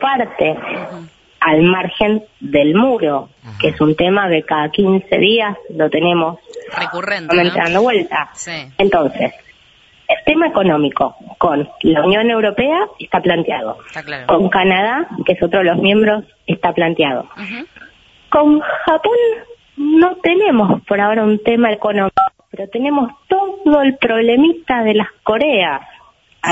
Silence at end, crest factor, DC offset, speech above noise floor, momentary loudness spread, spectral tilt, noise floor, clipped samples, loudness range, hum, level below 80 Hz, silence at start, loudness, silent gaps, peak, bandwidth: 0 s; 14 dB; under 0.1%; 35 dB; 11 LU; -6 dB/octave; -49 dBFS; under 0.1%; 2 LU; none; -48 dBFS; 0 s; -14 LUFS; none; -2 dBFS; 8 kHz